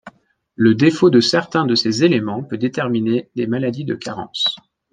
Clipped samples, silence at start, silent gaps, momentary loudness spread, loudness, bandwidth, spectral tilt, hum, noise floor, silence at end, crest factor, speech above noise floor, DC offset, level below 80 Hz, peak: under 0.1%; 0.05 s; none; 12 LU; -17 LUFS; 9.6 kHz; -5.5 dB/octave; none; -49 dBFS; 0.35 s; 16 dB; 32 dB; under 0.1%; -60 dBFS; -2 dBFS